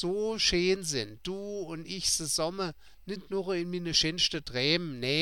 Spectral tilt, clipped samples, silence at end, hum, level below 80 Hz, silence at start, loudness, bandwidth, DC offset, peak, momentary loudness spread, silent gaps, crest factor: -3 dB/octave; under 0.1%; 0 s; none; -54 dBFS; 0 s; -29 LUFS; 17 kHz; 0.2%; -12 dBFS; 12 LU; none; 20 dB